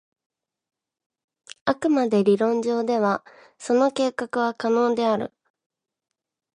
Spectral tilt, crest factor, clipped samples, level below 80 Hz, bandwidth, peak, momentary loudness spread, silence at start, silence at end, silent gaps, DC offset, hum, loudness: -5.5 dB/octave; 20 dB; under 0.1%; -68 dBFS; 11 kHz; -6 dBFS; 8 LU; 1.65 s; 1.3 s; none; under 0.1%; none; -22 LUFS